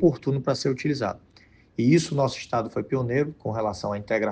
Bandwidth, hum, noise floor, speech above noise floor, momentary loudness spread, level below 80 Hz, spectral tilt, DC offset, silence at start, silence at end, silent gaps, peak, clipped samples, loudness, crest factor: 9.6 kHz; none; -55 dBFS; 31 dB; 8 LU; -58 dBFS; -6.5 dB/octave; under 0.1%; 0 s; 0 s; none; -8 dBFS; under 0.1%; -26 LUFS; 18 dB